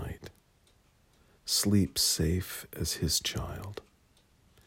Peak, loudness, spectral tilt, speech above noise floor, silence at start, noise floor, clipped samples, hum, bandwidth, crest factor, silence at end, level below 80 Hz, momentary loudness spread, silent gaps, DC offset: -14 dBFS; -29 LUFS; -3.5 dB/octave; 35 dB; 0 s; -66 dBFS; under 0.1%; none; 16.5 kHz; 20 dB; 0.85 s; -50 dBFS; 18 LU; none; under 0.1%